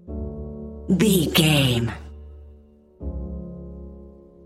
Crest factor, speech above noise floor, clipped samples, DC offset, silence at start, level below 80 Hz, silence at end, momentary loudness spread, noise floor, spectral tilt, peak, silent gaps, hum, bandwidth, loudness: 20 dB; 31 dB; under 0.1%; under 0.1%; 0.05 s; -38 dBFS; 0 s; 23 LU; -50 dBFS; -5 dB/octave; -4 dBFS; none; none; 16 kHz; -21 LUFS